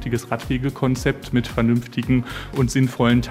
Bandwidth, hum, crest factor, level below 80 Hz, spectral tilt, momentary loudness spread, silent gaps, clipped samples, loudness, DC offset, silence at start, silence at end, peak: 15.5 kHz; none; 16 dB; -36 dBFS; -6.5 dB/octave; 6 LU; none; under 0.1%; -21 LUFS; under 0.1%; 0 s; 0 s; -4 dBFS